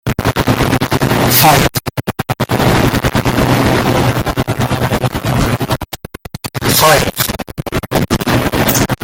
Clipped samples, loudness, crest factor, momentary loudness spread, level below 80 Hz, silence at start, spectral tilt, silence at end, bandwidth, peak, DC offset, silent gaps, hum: under 0.1%; -13 LUFS; 14 dB; 12 LU; -28 dBFS; 0.05 s; -4.5 dB/octave; 0.1 s; 17.5 kHz; 0 dBFS; under 0.1%; none; none